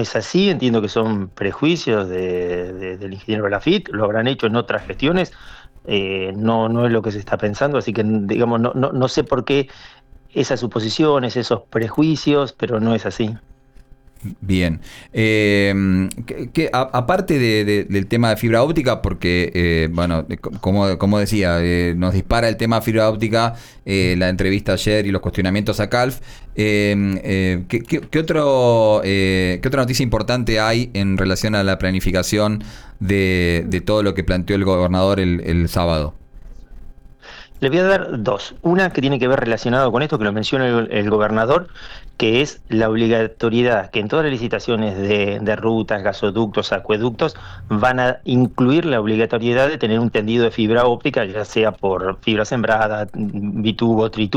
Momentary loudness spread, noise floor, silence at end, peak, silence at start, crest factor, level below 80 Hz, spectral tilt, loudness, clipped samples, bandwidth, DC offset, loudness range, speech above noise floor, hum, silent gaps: 6 LU; -45 dBFS; 0 s; -6 dBFS; 0 s; 12 dB; -36 dBFS; -6 dB/octave; -18 LUFS; under 0.1%; 19.5 kHz; under 0.1%; 3 LU; 27 dB; none; none